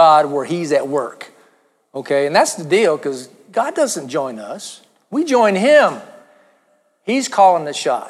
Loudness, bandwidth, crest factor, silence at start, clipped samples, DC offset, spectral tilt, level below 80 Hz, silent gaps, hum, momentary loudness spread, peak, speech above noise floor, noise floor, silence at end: -16 LUFS; 14 kHz; 16 dB; 0 s; under 0.1%; under 0.1%; -4 dB/octave; -74 dBFS; none; none; 19 LU; -2 dBFS; 44 dB; -60 dBFS; 0 s